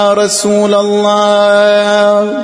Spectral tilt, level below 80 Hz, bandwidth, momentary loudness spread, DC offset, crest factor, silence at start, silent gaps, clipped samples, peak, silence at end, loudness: -3.5 dB/octave; -58 dBFS; 11 kHz; 3 LU; under 0.1%; 8 dB; 0 s; none; under 0.1%; 0 dBFS; 0 s; -9 LUFS